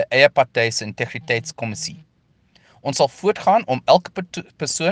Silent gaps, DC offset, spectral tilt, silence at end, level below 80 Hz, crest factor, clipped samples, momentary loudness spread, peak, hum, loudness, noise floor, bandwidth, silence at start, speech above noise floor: none; under 0.1%; -3.5 dB/octave; 0 s; -62 dBFS; 20 dB; under 0.1%; 15 LU; 0 dBFS; none; -20 LUFS; -59 dBFS; 10 kHz; 0 s; 39 dB